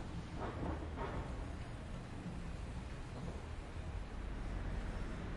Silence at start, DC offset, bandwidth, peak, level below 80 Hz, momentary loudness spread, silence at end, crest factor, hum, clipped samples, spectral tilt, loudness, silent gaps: 0 s; under 0.1%; 11.5 kHz; -28 dBFS; -46 dBFS; 5 LU; 0 s; 16 dB; none; under 0.1%; -6.5 dB/octave; -46 LUFS; none